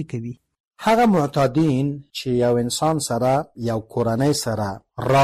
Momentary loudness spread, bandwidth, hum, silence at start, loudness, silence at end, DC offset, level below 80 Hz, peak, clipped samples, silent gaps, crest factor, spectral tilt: 11 LU; 15 kHz; none; 0 s; -21 LUFS; 0 s; under 0.1%; -50 dBFS; -8 dBFS; under 0.1%; 0.60-0.64 s; 12 dB; -5.5 dB/octave